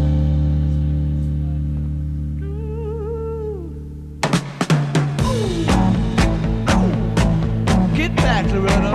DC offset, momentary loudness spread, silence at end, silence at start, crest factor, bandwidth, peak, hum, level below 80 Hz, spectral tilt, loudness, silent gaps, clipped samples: under 0.1%; 9 LU; 0 s; 0 s; 16 dB; 13 kHz; -2 dBFS; none; -24 dBFS; -6.5 dB/octave; -19 LUFS; none; under 0.1%